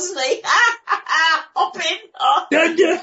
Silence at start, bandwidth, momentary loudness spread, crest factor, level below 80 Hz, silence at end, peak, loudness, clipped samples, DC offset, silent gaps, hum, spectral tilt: 0 s; 8 kHz; 7 LU; 14 dB; -74 dBFS; 0 s; -2 dBFS; -17 LUFS; under 0.1%; under 0.1%; none; none; -0.5 dB/octave